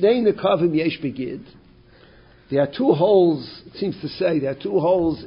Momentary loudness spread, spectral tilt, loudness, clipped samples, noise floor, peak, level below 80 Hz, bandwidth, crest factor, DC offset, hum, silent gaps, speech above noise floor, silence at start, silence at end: 12 LU; -11.5 dB/octave; -21 LUFS; under 0.1%; -50 dBFS; -4 dBFS; -54 dBFS; 5.4 kHz; 16 dB; under 0.1%; none; none; 30 dB; 0 s; 0 s